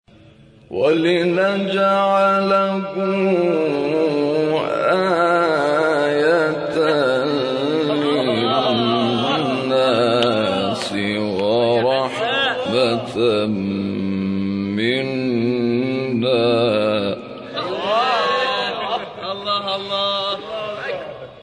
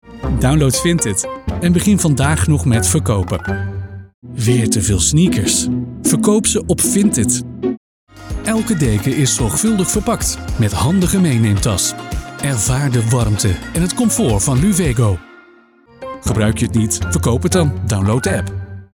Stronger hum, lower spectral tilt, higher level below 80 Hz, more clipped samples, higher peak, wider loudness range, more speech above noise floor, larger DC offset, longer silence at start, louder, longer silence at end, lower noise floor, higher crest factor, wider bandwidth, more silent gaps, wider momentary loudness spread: neither; about the same, -6 dB/octave vs -5 dB/octave; second, -60 dBFS vs -30 dBFS; neither; about the same, -2 dBFS vs 0 dBFS; about the same, 3 LU vs 3 LU; about the same, 30 dB vs 32 dB; neither; first, 0.7 s vs 0.05 s; second, -19 LUFS vs -15 LUFS; about the same, 0 s vs 0.1 s; about the same, -47 dBFS vs -47 dBFS; about the same, 16 dB vs 14 dB; second, 10.5 kHz vs 18.5 kHz; second, none vs 4.14-4.22 s, 7.77-8.07 s; second, 7 LU vs 10 LU